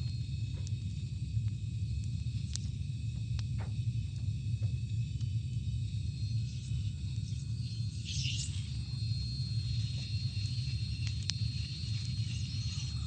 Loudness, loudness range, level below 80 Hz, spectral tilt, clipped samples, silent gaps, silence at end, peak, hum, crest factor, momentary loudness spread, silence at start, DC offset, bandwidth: -37 LUFS; 1 LU; -44 dBFS; -5 dB/octave; under 0.1%; none; 0 s; -8 dBFS; none; 26 dB; 3 LU; 0 s; under 0.1%; 9.2 kHz